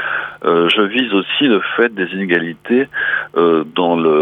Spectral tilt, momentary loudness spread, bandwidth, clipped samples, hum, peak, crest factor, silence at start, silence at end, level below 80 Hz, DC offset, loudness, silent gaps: -6.5 dB/octave; 4 LU; 8.8 kHz; under 0.1%; none; -2 dBFS; 14 dB; 0 s; 0 s; -62 dBFS; under 0.1%; -15 LUFS; none